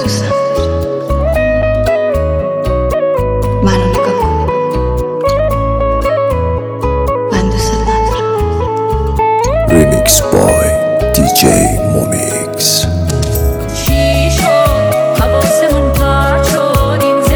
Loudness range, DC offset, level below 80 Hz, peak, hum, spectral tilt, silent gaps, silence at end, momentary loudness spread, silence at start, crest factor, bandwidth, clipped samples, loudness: 4 LU; under 0.1%; -20 dBFS; 0 dBFS; none; -5 dB/octave; none; 0 s; 6 LU; 0 s; 12 dB; over 20 kHz; 0.1%; -12 LUFS